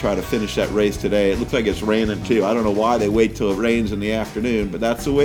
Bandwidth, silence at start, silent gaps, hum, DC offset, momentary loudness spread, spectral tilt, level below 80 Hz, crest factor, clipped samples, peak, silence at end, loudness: 19 kHz; 0 s; none; none; under 0.1%; 4 LU; -5.5 dB/octave; -36 dBFS; 14 dB; under 0.1%; -4 dBFS; 0 s; -20 LUFS